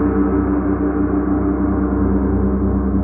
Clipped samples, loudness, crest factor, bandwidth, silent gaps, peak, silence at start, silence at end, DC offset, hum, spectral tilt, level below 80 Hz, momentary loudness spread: under 0.1%; -18 LUFS; 12 dB; 2.6 kHz; none; -4 dBFS; 0 s; 0 s; under 0.1%; none; -15.5 dB/octave; -24 dBFS; 1 LU